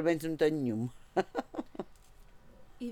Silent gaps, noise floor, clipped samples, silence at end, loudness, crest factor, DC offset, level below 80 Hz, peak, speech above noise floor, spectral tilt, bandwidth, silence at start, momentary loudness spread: none; -55 dBFS; under 0.1%; 0 s; -34 LUFS; 20 dB; under 0.1%; -60 dBFS; -16 dBFS; 23 dB; -6.5 dB/octave; 17 kHz; 0 s; 16 LU